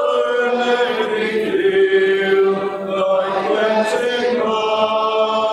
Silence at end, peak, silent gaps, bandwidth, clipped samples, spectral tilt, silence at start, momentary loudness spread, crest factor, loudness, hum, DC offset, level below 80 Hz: 0 s; -4 dBFS; none; 12 kHz; under 0.1%; -4.5 dB/octave; 0 s; 4 LU; 12 dB; -17 LUFS; none; under 0.1%; -62 dBFS